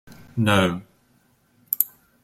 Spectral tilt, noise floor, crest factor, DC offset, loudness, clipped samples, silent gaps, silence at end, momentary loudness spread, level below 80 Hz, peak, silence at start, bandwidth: -5 dB/octave; -62 dBFS; 26 dB; under 0.1%; -22 LUFS; under 0.1%; none; 0.35 s; 14 LU; -56 dBFS; 0 dBFS; 0.1 s; 16.5 kHz